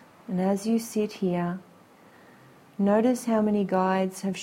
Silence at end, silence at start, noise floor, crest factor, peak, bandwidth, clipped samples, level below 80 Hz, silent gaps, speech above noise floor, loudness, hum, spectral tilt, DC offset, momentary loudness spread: 0 s; 0.3 s; -54 dBFS; 16 dB; -10 dBFS; 16 kHz; under 0.1%; -68 dBFS; none; 29 dB; -26 LUFS; none; -6.5 dB/octave; under 0.1%; 9 LU